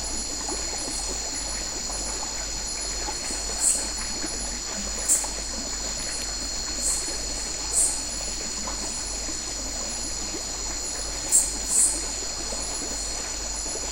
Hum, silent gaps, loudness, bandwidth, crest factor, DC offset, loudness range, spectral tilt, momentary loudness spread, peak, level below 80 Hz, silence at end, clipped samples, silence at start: none; none; -26 LUFS; 16 kHz; 24 dB; under 0.1%; 4 LU; -0.5 dB/octave; 7 LU; -4 dBFS; -40 dBFS; 0 s; under 0.1%; 0 s